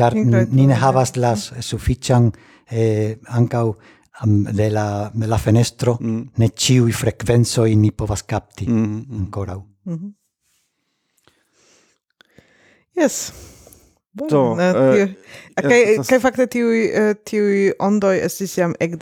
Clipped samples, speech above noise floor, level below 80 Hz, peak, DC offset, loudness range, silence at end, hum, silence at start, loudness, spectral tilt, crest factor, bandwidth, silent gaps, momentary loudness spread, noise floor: under 0.1%; 54 dB; -42 dBFS; -2 dBFS; under 0.1%; 11 LU; 0 s; none; 0 s; -18 LUFS; -6 dB/octave; 18 dB; 16 kHz; none; 12 LU; -71 dBFS